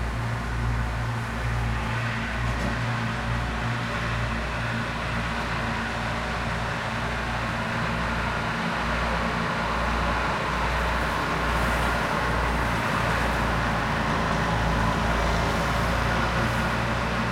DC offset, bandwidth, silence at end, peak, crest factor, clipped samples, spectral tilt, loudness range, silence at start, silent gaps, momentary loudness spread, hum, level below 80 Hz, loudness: under 0.1%; 16 kHz; 0 s; -10 dBFS; 16 dB; under 0.1%; -5.5 dB/octave; 3 LU; 0 s; none; 4 LU; none; -32 dBFS; -26 LUFS